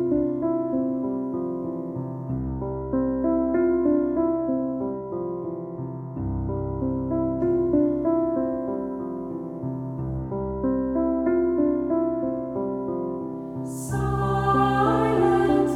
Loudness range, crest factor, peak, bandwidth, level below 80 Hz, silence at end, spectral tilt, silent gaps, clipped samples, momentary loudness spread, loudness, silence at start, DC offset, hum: 3 LU; 16 dB; -10 dBFS; 13 kHz; -42 dBFS; 0 s; -8 dB/octave; none; under 0.1%; 11 LU; -25 LUFS; 0 s; under 0.1%; none